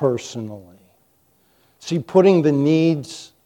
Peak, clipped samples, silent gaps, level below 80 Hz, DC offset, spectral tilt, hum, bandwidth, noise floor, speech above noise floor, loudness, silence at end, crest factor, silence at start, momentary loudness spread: -2 dBFS; under 0.1%; none; -66 dBFS; under 0.1%; -7 dB/octave; none; 10.5 kHz; -61 dBFS; 43 dB; -18 LUFS; 0.2 s; 18 dB; 0 s; 20 LU